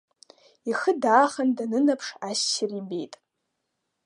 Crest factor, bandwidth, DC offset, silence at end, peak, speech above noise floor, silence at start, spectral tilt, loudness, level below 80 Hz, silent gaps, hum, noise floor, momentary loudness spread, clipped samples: 22 dB; 11.5 kHz; under 0.1%; 0.9 s; -4 dBFS; 55 dB; 0.65 s; -3 dB/octave; -25 LUFS; -82 dBFS; none; none; -80 dBFS; 14 LU; under 0.1%